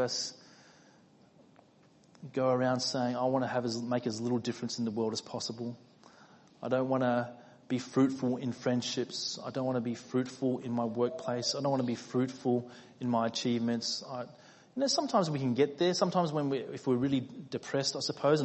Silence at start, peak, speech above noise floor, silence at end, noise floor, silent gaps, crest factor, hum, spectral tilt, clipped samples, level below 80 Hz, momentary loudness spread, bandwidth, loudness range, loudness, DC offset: 0 s; -14 dBFS; 31 dB; 0 s; -63 dBFS; none; 20 dB; none; -5 dB/octave; under 0.1%; -74 dBFS; 9 LU; 8.4 kHz; 4 LU; -32 LUFS; under 0.1%